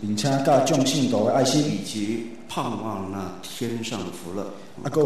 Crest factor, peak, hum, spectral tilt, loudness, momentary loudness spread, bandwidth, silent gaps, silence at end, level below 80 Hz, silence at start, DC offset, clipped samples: 16 dB; -10 dBFS; none; -5 dB/octave; -24 LUFS; 13 LU; 13.5 kHz; none; 0 s; -62 dBFS; 0 s; 0.8%; under 0.1%